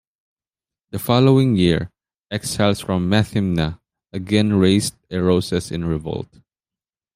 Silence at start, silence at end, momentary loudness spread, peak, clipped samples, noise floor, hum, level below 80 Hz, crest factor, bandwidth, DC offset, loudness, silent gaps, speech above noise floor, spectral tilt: 0.95 s; 0.9 s; 15 LU; -2 dBFS; under 0.1%; under -90 dBFS; none; -46 dBFS; 18 dB; 15.5 kHz; under 0.1%; -19 LUFS; none; over 72 dB; -6 dB/octave